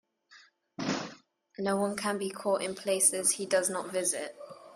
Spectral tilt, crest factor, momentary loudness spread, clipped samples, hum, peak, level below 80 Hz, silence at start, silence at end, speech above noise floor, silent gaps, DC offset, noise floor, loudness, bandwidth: -2.5 dB/octave; 24 dB; 18 LU; under 0.1%; none; -10 dBFS; -74 dBFS; 0.3 s; 0 s; 30 dB; none; under 0.1%; -60 dBFS; -30 LUFS; 15.5 kHz